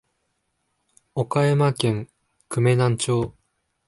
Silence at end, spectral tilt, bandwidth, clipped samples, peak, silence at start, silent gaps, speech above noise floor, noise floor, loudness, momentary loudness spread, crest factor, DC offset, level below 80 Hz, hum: 0.55 s; -6 dB/octave; 11.5 kHz; under 0.1%; -6 dBFS; 1.15 s; none; 53 dB; -73 dBFS; -22 LUFS; 12 LU; 18 dB; under 0.1%; -56 dBFS; none